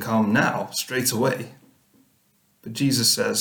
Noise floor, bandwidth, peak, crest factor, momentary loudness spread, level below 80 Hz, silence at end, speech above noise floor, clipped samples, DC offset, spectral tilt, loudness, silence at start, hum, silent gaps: -64 dBFS; over 20 kHz; -6 dBFS; 18 dB; 16 LU; -64 dBFS; 0 s; 42 dB; under 0.1%; under 0.1%; -3.5 dB/octave; -22 LUFS; 0 s; none; none